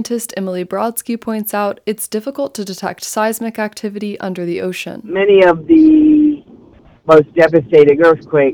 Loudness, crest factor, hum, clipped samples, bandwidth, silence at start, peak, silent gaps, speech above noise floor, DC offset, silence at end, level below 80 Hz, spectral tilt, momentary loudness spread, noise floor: -14 LUFS; 14 dB; none; 0.4%; over 20 kHz; 0 s; 0 dBFS; none; 31 dB; under 0.1%; 0 s; -50 dBFS; -5.5 dB/octave; 14 LU; -44 dBFS